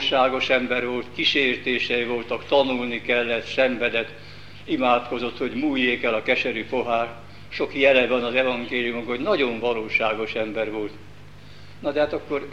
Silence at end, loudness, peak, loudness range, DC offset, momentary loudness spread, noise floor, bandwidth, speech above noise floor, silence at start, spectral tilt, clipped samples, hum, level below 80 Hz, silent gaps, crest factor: 0 s; -23 LUFS; -4 dBFS; 3 LU; 0.7%; 9 LU; -45 dBFS; 9 kHz; 22 dB; 0 s; -5 dB/octave; under 0.1%; 50 Hz at -50 dBFS; -54 dBFS; none; 20 dB